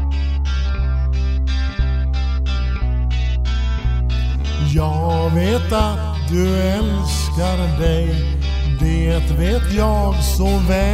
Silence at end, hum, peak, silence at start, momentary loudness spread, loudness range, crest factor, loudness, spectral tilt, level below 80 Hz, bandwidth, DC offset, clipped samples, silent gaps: 0 s; none; -4 dBFS; 0 s; 4 LU; 2 LU; 12 dB; -19 LUFS; -6.5 dB/octave; -18 dBFS; 15 kHz; under 0.1%; under 0.1%; none